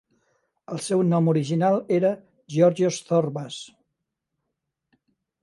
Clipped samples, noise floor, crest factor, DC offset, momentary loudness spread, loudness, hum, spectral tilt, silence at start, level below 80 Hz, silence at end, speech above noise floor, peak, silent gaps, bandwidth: under 0.1%; -81 dBFS; 20 dB; under 0.1%; 16 LU; -23 LUFS; none; -6.5 dB/octave; 0.7 s; -72 dBFS; 1.75 s; 59 dB; -6 dBFS; none; 11.5 kHz